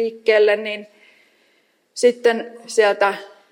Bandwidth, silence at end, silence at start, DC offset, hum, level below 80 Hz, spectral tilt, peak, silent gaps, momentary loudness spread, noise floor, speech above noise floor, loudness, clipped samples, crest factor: 15 kHz; 0.25 s; 0 s; under 0.1%; none; -78 dBFS; -2.5 dB/octave; -4 dBFS; none; 15 LU; -62 dBFS; 44 dB; -18 LUFS; under 0.1%; 16 dB